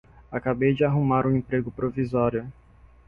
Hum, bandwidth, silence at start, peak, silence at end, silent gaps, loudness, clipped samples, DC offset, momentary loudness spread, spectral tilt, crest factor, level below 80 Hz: none; 5.2 kHz; 0.3 s; -10 dBFS; 0.55 s; none; -25 LUFS; under 0.1%; under 0.1%; 10 LU; -10.5 dB/octave; 16 dB; -50 dBFS